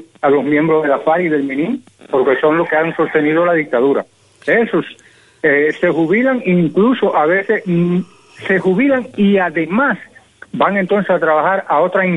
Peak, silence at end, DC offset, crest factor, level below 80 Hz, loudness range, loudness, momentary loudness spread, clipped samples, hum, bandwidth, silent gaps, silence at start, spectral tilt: 0 dBFS; 0 s; under 0.1%; 14 dB; -58 dBFS; 1 LU; -14 LUFS; 7 LU; under 0.1%; none; 10.5 kHz; none; 0.25 s; -8 dB/octave